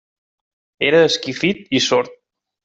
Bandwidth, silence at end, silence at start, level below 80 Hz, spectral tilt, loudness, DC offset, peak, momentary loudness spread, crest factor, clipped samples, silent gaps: 8 kHz; 0.5 s; 0.8 s; -62 dBFS; -3.5 dB/octave; -17 LUFS; under 0.1%; -2 dBFS; 7 LU; 18 dB; under 0.1%; none